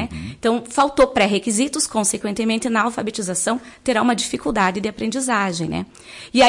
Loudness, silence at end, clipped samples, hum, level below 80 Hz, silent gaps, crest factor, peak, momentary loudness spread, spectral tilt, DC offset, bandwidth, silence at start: -20 LUFS; 0 s; under 0.1%; none; -48 dBFS; none; 16 dB; -4 dBFS; 9 LU; -3.5 dB/octave; under 0.1%; 11.5 kHz; 0 s